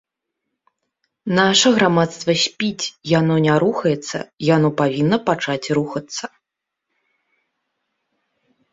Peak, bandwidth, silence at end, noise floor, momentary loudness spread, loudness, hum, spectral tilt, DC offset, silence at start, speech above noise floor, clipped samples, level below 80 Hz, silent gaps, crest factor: -2 dBFS; 7.8 kHz; 2.45 s; -82 dBFS; 13 LU; -18 LUFS; none; -4.5 dB/octave; under 0.1%; 1.25 s; 64 dB; under 0.1%; -60 dBFS; none; 18 dB